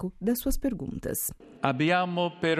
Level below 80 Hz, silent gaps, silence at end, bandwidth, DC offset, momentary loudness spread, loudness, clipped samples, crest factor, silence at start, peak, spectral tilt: -42 dBFS; none; 0 s; 15.5 kHz; under 0.1%; 8 LU; -29 LUFS; under 0.1%; 20 dB; 0 s; -8 dBFS; -4.5 dB/octave